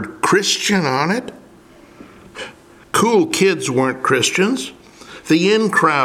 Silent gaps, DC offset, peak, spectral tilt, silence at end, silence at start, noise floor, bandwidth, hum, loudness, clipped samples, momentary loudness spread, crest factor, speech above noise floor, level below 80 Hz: none; under 0.1%; -2 dBFS; -3.5 dB/octave; 0 s; 0 s; -45 dBFS; 16 kHz; none; -16 LUFS; under 0.1%; 19 LU; 16 dB; 29 dB; -58 dBFS